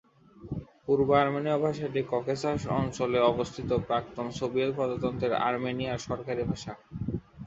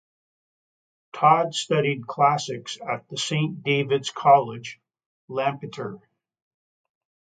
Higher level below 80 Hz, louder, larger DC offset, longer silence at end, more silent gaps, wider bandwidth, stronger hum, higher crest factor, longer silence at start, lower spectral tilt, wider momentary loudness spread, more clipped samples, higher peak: first, -52 dBFS vs -72 dBFS; second, -29 LUFS vs -23 LUFS; neither; second, 0 s vs 1.4 s; second, none vs 5.06-5.28 s; second, 8 kHz vs 9.4 kHz; neither; about the same, 20 dB vs 22 dB; second, 0.35 s vs 1.15 s; first, -6.5 dB/octave vs -4.5 dB/octave; second, 12 LU vs 16 LU; neither; second, -8 dBFS vs -4 dBFS